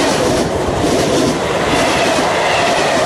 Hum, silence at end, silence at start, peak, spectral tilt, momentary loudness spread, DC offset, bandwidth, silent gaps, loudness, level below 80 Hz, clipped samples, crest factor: none; 0 s; 0 s; -2 dBFS; -4 dB/octave; 3 LU; under 0.1%; 16 kHz; none; -14 LUFS; -34 dBFS; under 0.1%; 12 dB